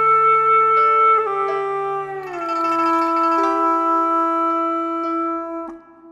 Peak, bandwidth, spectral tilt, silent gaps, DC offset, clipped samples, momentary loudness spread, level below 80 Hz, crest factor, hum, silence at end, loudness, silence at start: -8 dBFS; 9.4 kHz; -5 dB/octave; none; under 0.1%; under 0.1%; 13 LU; -64 dBFS; 10 dB; none; 0 s; -17 LUFS; 0 s